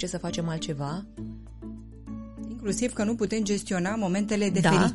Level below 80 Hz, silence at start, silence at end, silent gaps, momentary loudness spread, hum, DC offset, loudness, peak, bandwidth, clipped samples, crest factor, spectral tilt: -48 dBFS; 0 s; 0 s; none; 18 LU; none; under 0.1%; -28 LUFS; -10 dBFS; 11.5 kHz; under 0.1%; 18 dB; -5.5 dB/octave